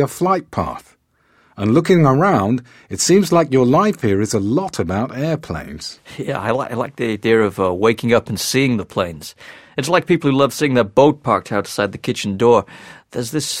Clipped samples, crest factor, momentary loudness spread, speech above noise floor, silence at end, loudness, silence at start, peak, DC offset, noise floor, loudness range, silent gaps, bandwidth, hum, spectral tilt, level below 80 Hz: under 0.1%; 16 dB; 13 LU; 41 dB; 0 s; -17 LUFS; 0 s; 0 dBFS; under 0.1%; -58 dBFS; 5 LU; none; 16.5 kHz; none; -5.5 dB/octave; -48 dBFS